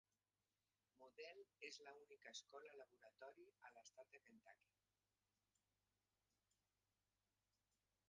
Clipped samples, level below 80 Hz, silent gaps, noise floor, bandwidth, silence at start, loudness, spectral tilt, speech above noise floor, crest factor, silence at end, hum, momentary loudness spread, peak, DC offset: under 0.1%; under -90 dBFS; none; under -90 dBFS; 7.4 kHz; 0.95 s; -63 LUFS; 0.5 dB/octave; over 26 dB; 26 dB; 3.55 s; 50 Hz at -100 dBFS; 9 LU; -42 dBFS; under 0.1%